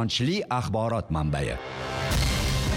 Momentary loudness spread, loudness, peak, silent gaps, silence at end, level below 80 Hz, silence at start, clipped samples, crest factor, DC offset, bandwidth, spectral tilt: 6 LU; -27 LUFS; -12 dBFS; none; 0 s; -34 dBFS; 0 s; under 0.1%; 14 dB; under 0.1%; 16.5 kHz; -5 dB/octave